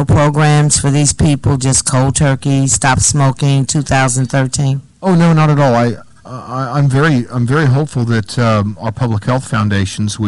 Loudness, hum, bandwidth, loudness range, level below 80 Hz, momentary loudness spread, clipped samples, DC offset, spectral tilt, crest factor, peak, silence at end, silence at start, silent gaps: -12 LUFS; none; 11.5 kHz; 3 LU; -34 dBFS; 8 LU; under 0.1%; under 0.1%; -5 dB/octave; 10 dB; -2 dBFS; 0 s; 0 s; none